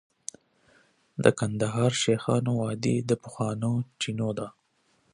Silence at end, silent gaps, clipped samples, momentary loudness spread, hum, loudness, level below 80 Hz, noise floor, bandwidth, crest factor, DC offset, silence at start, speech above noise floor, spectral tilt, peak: 0.65 s; none; under 0.1%; 17 LU; none; -27 LUFS; -62 dBFS; -69 dBFS; 11 kHz; 24 dB; under 0.1%; 1.15 s; 43 dB; -5.5 dB/octave; -4 dBFS